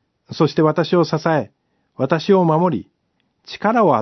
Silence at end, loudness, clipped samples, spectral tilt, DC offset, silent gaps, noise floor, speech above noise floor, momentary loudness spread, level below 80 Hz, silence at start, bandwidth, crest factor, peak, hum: 0 s; -18 LUFS; under 0.1%; -7.5 dB/octave; under 0.1%; none; -68 dBFS; 51 dB; 13 LU; -64 dBFS; 0.3 s; 6.2 kHz; 16 dB; -2 dBFS; none